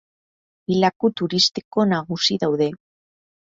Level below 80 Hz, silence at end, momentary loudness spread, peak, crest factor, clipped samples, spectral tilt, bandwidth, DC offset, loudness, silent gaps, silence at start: -62 dBFS; 0.75 s; 6 LU; -4 dBFS; 20 dB; under 0.1%; -4.5 dB/octave; 7.8 kHz; under 0.1%; -20 LUFS; 0.96-1.00 s, 1.65-1.71 s; 0.7 s